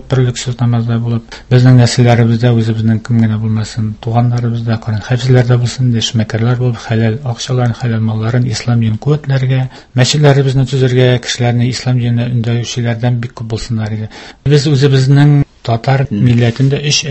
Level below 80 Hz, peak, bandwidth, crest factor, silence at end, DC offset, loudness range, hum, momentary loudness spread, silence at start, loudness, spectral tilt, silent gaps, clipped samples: -38 dBFS; 0 dBFS; 8.4 kHz; 12 dB; 0 s; under 0.1%; 3 LU; none; 9 LU; 0.05 s; -12 LUFS; -6 dB/octave; none; 0.3%